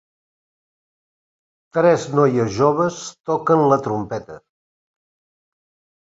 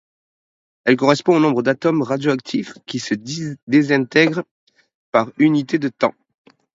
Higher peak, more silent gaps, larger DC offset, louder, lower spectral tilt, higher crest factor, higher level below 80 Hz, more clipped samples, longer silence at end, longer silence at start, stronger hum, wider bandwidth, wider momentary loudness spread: about the same, -2 dBFS vs 0 dBFS; second, 3.20-3.24 s vs 3.62-3.67 s, 4.51-4.67 s, 4.95-5.12 s; neither; about the same, -18 LUFS vs -18 LUFS; about the same, -6.5 dB/octave vs -6 dB/octave; about the same, 20 dB vs 18 dB; first, -58 dBFS vs -66 dBFS; neither; first, 1.65 s vs 0.65 s; first, 1.75 s vs 0.85 s; neither; about the same, 8 kHz vs 7.8 kHz; about the same, 11 LU vs 12 LU